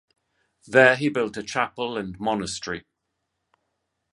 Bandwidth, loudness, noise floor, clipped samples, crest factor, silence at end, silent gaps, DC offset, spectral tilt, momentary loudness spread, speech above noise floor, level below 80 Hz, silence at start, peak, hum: 11.5 kHz; -23 LUFS; -79 dBFS; under 0.1%; 24 dB; 1.3 s; none; under 0.1%; -4.5 dB/octave; 14 LU; 56 dB; -60 dBFS; 0.65 s; -2 dBFS; none